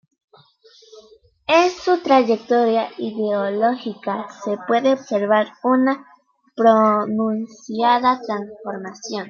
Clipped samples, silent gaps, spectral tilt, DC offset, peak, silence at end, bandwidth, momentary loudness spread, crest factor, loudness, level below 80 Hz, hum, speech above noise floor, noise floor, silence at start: under 0.1%; none; -5 dB/octave; under 0.1%; -2 dBFS; 0 s; 7.2 kHz; 13 LU; 18 dB; -19 LUFS; -68 dBFS; none; 33 dB; -52 dBFS; 0.95 s